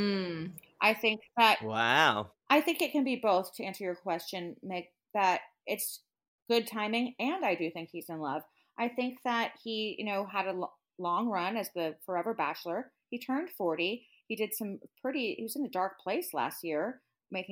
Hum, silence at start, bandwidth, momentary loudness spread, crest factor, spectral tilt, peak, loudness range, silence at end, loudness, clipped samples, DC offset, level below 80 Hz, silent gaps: none; 0 s; 17 kHz; 14 LU; 22 dB; -4 dB/octave; -10 dBFS; 7 LU; 0 s; -32 LUFS; under 0.1%; under 0.1%; -82 dBFS; 6.28-6.38 s